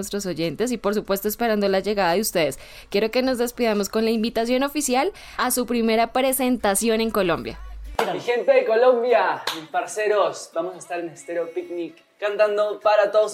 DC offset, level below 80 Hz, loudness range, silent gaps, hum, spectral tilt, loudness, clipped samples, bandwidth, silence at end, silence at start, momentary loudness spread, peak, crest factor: under 0.1%; -48 dBFS; 3 LU; none; none; -3.5 dB/octave; -22 LUFS; under 0.1%; 17 kHz; 0 s; 0 s; 11 LU; -6 dBFS; 16 dB